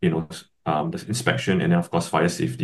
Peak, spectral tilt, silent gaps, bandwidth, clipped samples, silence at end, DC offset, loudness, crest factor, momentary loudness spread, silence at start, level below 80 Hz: -4 dBFS; -5.5 dB/octave; none; 12.5 kHz; under 0.1%; 0 s; under 0.1%; -23 LUFS; 20 dB; 8 LU; 0 s; -54 dBFS